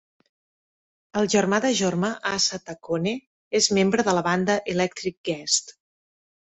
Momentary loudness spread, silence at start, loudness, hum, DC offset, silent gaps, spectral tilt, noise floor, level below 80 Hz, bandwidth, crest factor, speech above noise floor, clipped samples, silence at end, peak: 9 LU; 1.15 s; -23 LUFS; none; under 0.1%; 3.27-3.51 s, 5.17-5.24 s; -3.5 dB/octave; under -90 dBFS; -62 dBFS; 8.4 kHz; 18 dB; over 67 dB; under 0.1%; 0.8 s; -6 dBFS